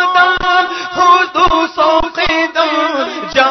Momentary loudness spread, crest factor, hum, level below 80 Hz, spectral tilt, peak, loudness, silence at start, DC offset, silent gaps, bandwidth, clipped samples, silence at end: 6 LU; 12 dB; none; -34 dBFS; -3 dB/octave; 0 dBFS; -12 LUFS; 0 s; under 0.1%; none; 6.4 kHz; under 0.1%; 0 s